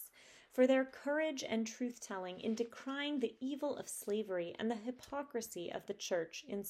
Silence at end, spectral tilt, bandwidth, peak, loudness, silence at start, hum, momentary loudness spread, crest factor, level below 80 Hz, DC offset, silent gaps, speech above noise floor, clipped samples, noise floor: 0 s; -3.5 dB/octave; 16 kHz; -18 dBFS; -39 LUFS; 0 s; none; 10 LU; 20 dB; -80 dBFS; under 0.1%; none; 23 dB; under 0.1%; -62 dBFS